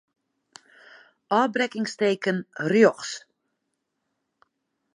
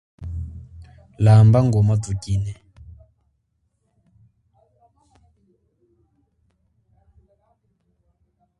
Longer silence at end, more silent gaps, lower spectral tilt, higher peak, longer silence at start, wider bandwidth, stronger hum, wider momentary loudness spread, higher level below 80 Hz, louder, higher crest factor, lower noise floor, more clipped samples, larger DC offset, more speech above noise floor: second, 1.75 s vs 6.05 s; neither; second, -5 dB/octave vs -8.5 dB/octave; about the same, -4 dBFS vs -2 dBFS; first, 1.3 s vs 0.2 s; about the same, 11 kHz vs 10.5 kHz; neither; second, 14 LU vs 23 LU; second, -78 dBFS vs -42 dBFS; second, -24 LUFS vs -18 LUFS; about the same, 22 dB vs 20 dB; first, -79 dBFS vs -70 dBFS; neither; neither; about the same, 56 dB vs 55 dB